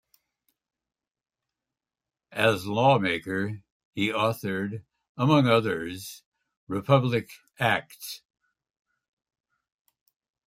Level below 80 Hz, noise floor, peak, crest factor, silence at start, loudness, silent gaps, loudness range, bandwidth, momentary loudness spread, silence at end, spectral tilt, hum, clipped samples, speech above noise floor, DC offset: -68 dBFS; under -90 dBFS; -6 dBFS; 24 dB; 2.3 s; -25 LUFS; 3.72-3.93 s, 5.09-5.15 s, 6.26-6.32 s, 6.57-6.67 s; 4 LU; 16 kHz; 18 LU; 2.3 s; -6 dB/octave; none; under 0.1%; over 65 dB; under 0.1%